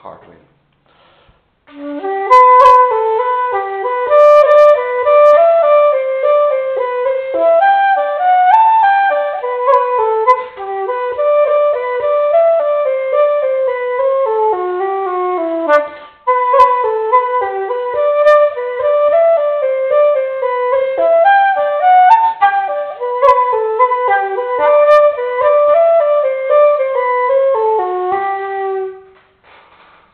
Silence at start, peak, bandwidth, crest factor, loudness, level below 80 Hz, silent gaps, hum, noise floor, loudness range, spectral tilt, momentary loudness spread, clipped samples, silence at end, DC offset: 0.05 s; 0 dBFS; 6.4 kHz; 12 dB; -12 LUFS; -58 dBFS; none; none; -52 dBFS; 4 LU; -4.5 dB/octave; 10 LU; 0.1%; 1.15 s; under 0.1%